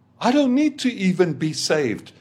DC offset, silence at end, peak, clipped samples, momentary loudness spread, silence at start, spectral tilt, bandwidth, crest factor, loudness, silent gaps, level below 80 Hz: under 0.1%; 0.1 s; -4 dBFS; under 0.1%; 5 LU; 0.2 s; -5 dB/octave; 14 kHz; 16 dB; -21 LUFS; none; -70 dBFS